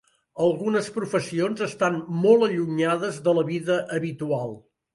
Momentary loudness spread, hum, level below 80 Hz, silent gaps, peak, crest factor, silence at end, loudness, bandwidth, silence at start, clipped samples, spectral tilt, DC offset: 9 LU; none; -68 dBFS; none; -6 dBFS; 18 dB; 0.35 s; -24 LUFS; 11.5 kHz; 0.35 s; under 0.1%; -6 dB/octave; under 0.1%